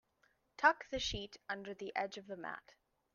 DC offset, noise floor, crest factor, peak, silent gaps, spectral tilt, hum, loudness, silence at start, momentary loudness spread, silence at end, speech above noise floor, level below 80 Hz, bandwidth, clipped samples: under 0.1%; -76 dBFS; 26 dB; -14 dBFS; none; -3 dB/octave; none; -38 LUFS; 0.6 s; 14 LU; 0.55 s; 38 dB; -62 dBFS; 7.4 kHz; under 0.1%